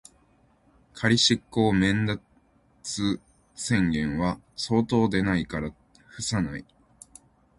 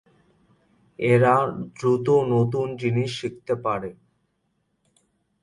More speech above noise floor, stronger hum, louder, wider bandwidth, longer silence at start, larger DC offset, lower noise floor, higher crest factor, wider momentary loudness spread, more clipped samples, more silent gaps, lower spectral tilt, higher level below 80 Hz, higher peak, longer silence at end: second, 37 dB vs 50 dB; neither; second, -26 LUFS vs -23 LUFS; about the same, 11.5 kHz vs 11 kHz; about the same, 0.95 s vs 1 s; neither; second, -62 dBFS vs -72 dBFS; about the same, 20 dB vs 18 dB; first, 13 LU vs 10 LU; neither; neither; second, -4.5 dB/octave vs -7.5 dB/octave; first, -48 dBFS vs -60 dBFS; about the same, -8 dBFS vs -6 dBFS; second, 0.95 s vs 1.5 s